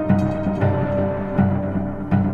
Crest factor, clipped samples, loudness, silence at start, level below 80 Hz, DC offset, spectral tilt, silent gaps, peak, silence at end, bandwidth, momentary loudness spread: 14 dB; under 0.1%; -21 LUFS; 0 s; -38 dBFS; under 0.1%; -10 dB/octave; none; -6 dBFS; 0 s; 4.8 kHz; 4 LU